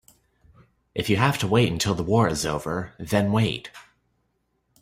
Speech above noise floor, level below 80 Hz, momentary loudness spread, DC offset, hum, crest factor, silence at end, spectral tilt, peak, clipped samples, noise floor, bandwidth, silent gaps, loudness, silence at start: 49 dB; -50 dBFS; 10 LU; under 0.1%; none; 20 dB; 1 s; -5.5 dB/octave; -4 dBFS; under 0.1%; -72 dBFS; 16 kHz; none; -24 LUFS; 0.95 s